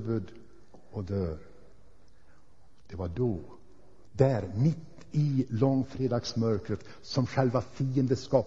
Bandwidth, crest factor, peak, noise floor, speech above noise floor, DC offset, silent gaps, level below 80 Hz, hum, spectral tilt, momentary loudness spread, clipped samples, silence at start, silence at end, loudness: 7.8 kHz; 22 dB; -8 dBFS; -62 dBFS; 33 dB; 0.4%; none; -54 dBFS; none; -7.5 dB/octave; 13 LU; under 0.1%; 0 s; 0 s; -30 LUFS